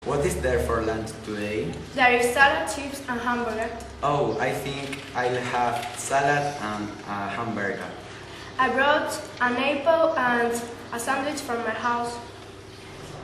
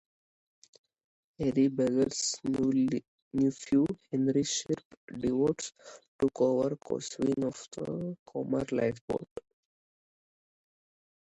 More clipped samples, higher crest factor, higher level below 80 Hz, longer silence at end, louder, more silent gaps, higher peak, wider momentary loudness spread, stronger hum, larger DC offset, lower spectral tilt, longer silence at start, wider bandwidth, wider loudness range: neither; about the same, 20 dB vs 16 dB; first, -46 dBFS vs -62 dBFS; second, 0 s vs 1.95 s; first, -25 LUFS vs -31 LUFS; second, none vs 3.08-3.31 s, 4.85-4.90 s, 4.97-5.08 s, 6.08-6.19 s, 8.19-8.26 s, 9.01-9.08 s, 9.31-9.36 s; first, -4 dBFS vs -14 dBFS; first, 14 LU vs 10 LU; neither; neither; about the same, -4 dB/octave vs -5 dB/octave; second, 0 s vs 1.4 s; first, 13 kHz vs 9 kHz; second, 4 LU vs 7 LU